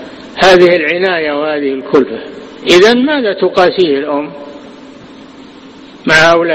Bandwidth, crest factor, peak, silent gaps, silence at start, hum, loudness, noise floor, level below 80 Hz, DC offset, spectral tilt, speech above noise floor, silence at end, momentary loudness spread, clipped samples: 11.5 kHz; 12 dB; 0 dBFS; none; 0 s; none; -10 LUFS; -34 dBFS; -46 dBFS; under 0.1%; -4.5 dB/octave; 24 dB; 0 s; 18 LU; 0.8%